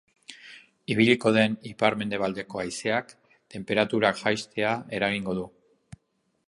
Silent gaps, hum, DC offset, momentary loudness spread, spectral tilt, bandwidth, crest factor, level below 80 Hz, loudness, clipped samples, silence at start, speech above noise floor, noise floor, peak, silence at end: none; none; under 0.1%; 22 LU; -5 dB/octave; 11.5 kHz; 22 dB; -62 dBFS; -26 LUFS; under 0.1%; 0.3 s; 48 dB; -74 dBFS; -4 dBFS; 1 s